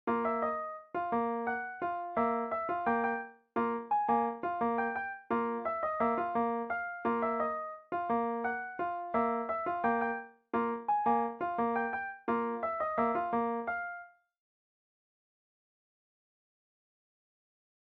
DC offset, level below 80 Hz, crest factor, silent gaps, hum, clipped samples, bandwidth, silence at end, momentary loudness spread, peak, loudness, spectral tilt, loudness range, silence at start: under 0.1%; -70 dBFS; 16 dB; none; none; under 0.1%; 4.7 kHz; 3.9 s; 6 LU; -18 dBFS; -33 LUFS; -8.5 dB/octave; 3 LU; 0.05 s